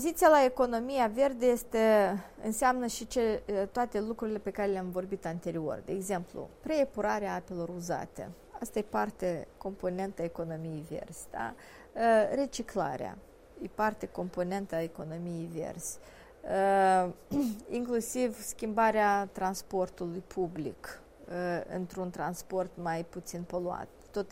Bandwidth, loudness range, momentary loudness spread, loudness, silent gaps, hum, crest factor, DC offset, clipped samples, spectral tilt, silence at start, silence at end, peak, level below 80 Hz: 16 kHz; 7 LU; 15 LU; -32 LUFS; none; none; 20 dB; under 0.1%; under 0.1%; -5 dB/octave; 0 s; 0 s; -12 dBFS; -58 dBFS